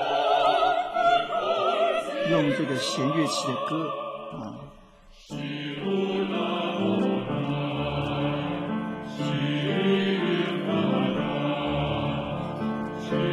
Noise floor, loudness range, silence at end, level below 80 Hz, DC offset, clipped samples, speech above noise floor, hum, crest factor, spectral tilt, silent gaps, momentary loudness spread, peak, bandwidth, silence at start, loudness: -51 dBFS; 5 LU; 0 s; -52 dBFS; under 0.1%; under 0.1%; 24 dB; none; 18 dB; -6 dB/octave; none; 9 LU; -8 dBFS; 13.5 kHz; 0 s; -26 LUFS